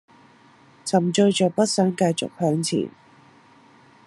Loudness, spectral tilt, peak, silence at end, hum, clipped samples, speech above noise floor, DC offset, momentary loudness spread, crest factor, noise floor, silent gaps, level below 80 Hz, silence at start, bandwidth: -21 LUFS; -5 dB/octave; -6 dBFS; 1.15 s; none; under 0.1%; 32 dB; under 0.1%; 8 LU; 18 dB; -53 dBFS; none; -68 dBFS; 0.85 s; 12 kHz